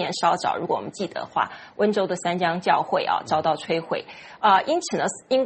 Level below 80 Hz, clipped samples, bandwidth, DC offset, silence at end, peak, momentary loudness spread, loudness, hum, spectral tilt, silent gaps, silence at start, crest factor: -66 dBFS; under 0.1%; 8.8 kHz; under 0.1%; 0 s; -4 dBFS; 9 LU; -24 LUFS; none; -4 dB/octave; none; 0 s; 18 dB